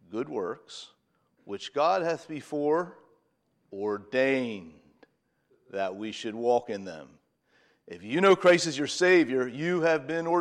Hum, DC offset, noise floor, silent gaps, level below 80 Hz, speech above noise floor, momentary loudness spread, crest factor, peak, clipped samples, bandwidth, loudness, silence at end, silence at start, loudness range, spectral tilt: none; under 0.1%; -72 dBFS; none; -78 dBFS; 46 dB; 20 LU; 20 dB; -10 dBFS; under 0.1%; 10.5 kHz; -27 LUFS; 0 s; 0.1 s; 9 LU; -4.5 dB/octave